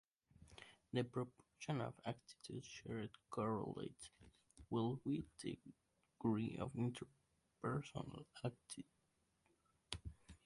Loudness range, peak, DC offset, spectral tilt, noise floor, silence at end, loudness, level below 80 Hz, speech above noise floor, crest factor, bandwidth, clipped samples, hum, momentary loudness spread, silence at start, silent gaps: 4 LU; -24 dBFS; under 0.1%; -6.5 dB/octave; -83 dBFS; 0.1 s; -47 LUFS; -70 dBFS; 37 dB; 22 dB; 11.5 kHz; under 0.1%; none; 16 LU; 0.4 s; none